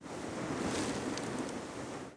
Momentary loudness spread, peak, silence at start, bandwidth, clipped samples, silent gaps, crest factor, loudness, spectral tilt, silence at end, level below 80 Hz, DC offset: 7 LU; -22 dBFS; 0 s; 10.5 kHz; under 0.1%; none; 16 dB; -38 LUFS; -4.5 dB/octave; 0 s; -60 dBFS; under 0.1%